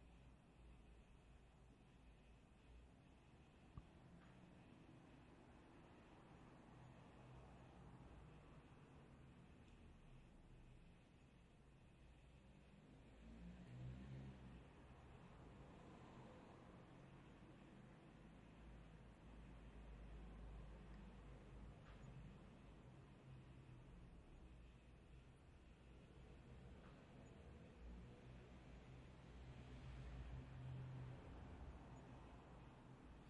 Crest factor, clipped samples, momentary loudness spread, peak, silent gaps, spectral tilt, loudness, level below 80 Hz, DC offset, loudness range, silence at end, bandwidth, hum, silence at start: 18 dB; under 0.1%; 10 LU; -44 dBFS; none; -7 dB/octave; -63 LUFS; -66 dBFS; under 0.1%; 9 LU; 0 s; 10 kHz; none; 0 s